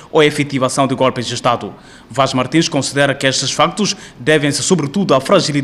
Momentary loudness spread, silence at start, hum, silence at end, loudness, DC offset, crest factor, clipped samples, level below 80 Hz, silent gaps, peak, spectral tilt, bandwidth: 5 LU; 0 s; none; 0 s; -15 LUFS; under 0.1%; 16 dB; under 0.1%; -50 dBFS; none; 0 dBFS; -4 dB/octave; 13.5 kHz